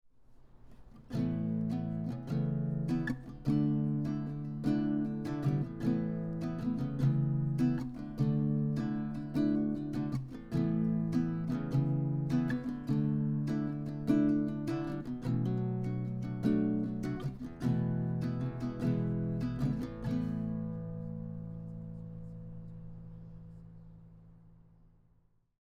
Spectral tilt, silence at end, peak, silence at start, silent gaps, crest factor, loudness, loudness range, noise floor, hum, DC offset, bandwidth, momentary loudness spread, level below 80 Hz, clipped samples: -9.5 dB/octave; 1.15 s; -16 dBFS; 0.2 s; none; 18 dB; -34 LUFS; 10 LU; -69 dBFS; none; under 0.1%; 7.4 kHz; 13 LU; -54 dBFS; under 0.1%